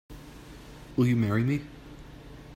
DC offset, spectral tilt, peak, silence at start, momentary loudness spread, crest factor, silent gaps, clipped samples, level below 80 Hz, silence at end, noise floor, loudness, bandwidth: under 0.1%; -8 dB/octave; -12 dBFS; 0.1 s; 22 LU; 18 dB; none; under 0.1%; -52 dBFS; 0 s; -46 dBFS; -27 LUFS; 16 kHz